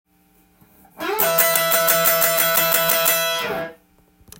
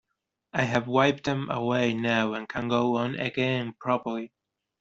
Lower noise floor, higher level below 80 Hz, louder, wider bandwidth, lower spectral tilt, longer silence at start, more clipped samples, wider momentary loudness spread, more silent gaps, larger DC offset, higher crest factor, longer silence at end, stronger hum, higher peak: second, -58 dBFS vs -82 dBFS; about the same, -60 dBFS vs -64 dBFS; first, -16 LUFS vs -27 LUFS; first, 17 kHz vs 7.8 kHz; second, -1 dB/octave vs -6 dB/octave; first, 1 s vs 0.55 s; neither; first, 12 LU vs 8 LU; neither; neither; about the same, 20 dB vs 20 dB; about the same, 0.65 s vs 0.55 s; neither; first, 0 dBFS vs -6 dBFS